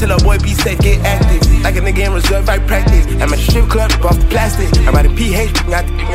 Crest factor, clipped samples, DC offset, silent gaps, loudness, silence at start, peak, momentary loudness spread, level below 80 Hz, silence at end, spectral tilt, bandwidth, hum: 10 dB; under 0.1%; under 0.1%; none; -13 LUFS; 0 s; 0 dBFS; 3 LU; -12 dBFS; 0 s; -5 dB/octave; 16 kHz; none